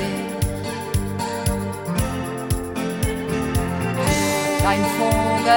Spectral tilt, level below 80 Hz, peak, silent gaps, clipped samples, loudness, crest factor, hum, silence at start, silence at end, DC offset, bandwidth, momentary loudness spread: -5 dB/octave; -34 dBFS; -4 dBFS; none; under 0.1%; -22 LUFS; 16 dB; none; 0 s; 0 s; under 0.1%; 17.5 kHz; 7 LU